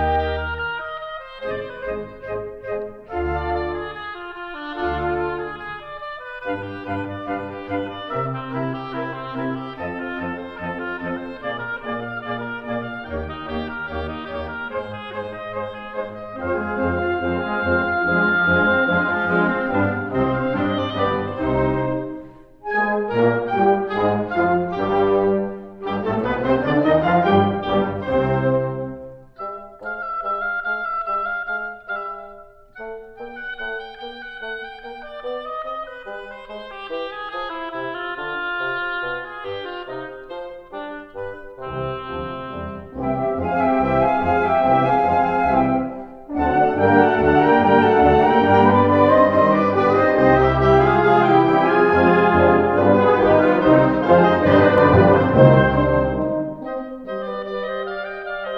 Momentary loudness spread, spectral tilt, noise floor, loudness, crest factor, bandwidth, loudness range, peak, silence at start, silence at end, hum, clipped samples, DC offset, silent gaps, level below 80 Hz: 17 LU; -9 dB/octave; -43 dBFS; -20 LUFS; 20 dB; 6.6 kHz; 15 LU; 0 dBFS; 0 s; 0 s; none; under 0.1%; under 0.1%; none; -40 dBFS